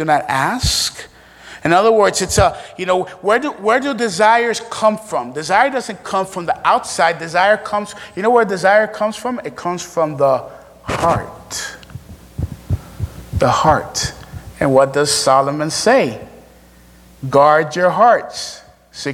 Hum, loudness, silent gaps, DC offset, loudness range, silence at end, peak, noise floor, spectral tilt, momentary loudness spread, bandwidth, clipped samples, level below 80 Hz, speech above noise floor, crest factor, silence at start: none; -16 LUFS; none; under 0.1%; 5 LU; 0 s; 0 dBFS; -45 dBFS; -4 dB/octave; 15 LU; 17 kHz; under 0.1%; -38 dBFS; 29 dB; 16 dB; 0 s